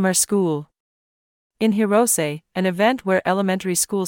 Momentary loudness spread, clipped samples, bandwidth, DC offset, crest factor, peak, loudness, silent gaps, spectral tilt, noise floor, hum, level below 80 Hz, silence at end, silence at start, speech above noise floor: 7 LU; under 0.1%; 18 kHz; under 0.1%; 14 dB; -6 dBFS; -20 LUFS; 0.80-1.50 s; -4 dB/octave; under -90 dBFS; none; -64 dBFS; 0 s; 0 s; over 70 dB